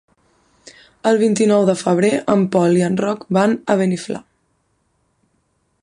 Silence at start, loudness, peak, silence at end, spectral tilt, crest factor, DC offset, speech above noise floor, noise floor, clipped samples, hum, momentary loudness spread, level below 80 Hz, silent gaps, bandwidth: 1.05 s; -17 LUFS; -2 dBFS; 1.65 s; -6 dB/octave; 16 dB; under 0.1%; 50 dB; -65 dBFS; under 0.1%; none; 7 LU; -60 dBFS; none; 11 kHz